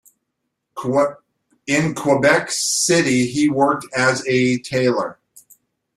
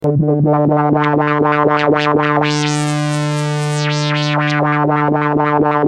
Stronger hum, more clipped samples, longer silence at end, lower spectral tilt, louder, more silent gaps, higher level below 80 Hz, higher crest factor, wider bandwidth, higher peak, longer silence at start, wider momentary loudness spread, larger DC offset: neither; neither; first, 0.85 s vs 0 s; second, -4 dB/octave vs -6 dB/octave; second, -18 LUFS vs -14 LUFS; neither; second, -58 dBFS vs -50 dBFS; first, 18 dB vs 12 dB; first, 15 kHz vs 10.5 kHz; about the same, -2 dBFS vs -2 dBFS; first, 0.75 s vs 0 s; first, 8 LU vs 4 LU; neither